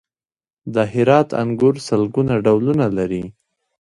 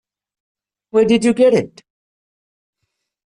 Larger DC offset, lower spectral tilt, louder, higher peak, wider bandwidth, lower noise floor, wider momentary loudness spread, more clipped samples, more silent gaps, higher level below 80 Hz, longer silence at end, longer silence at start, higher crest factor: neither; first, -7.5 dB/octave vs -5.5 dB/octave; second, -18 LUFS vs -15 LUFS; first, 0 dBFS vs -4 dBFS; about the same, 11.5 kHz vs 11 kHz; first, under -90 dBFS vs -75 dBFS; first, 10 LU vs 7 LU; neither; neither; first, -50 dBFS vs -58 dBFS; second, 0.5 s vs 1.65 s; second, 0.65 s vs 0.95 s; about the same, 18 dB vs 16 dB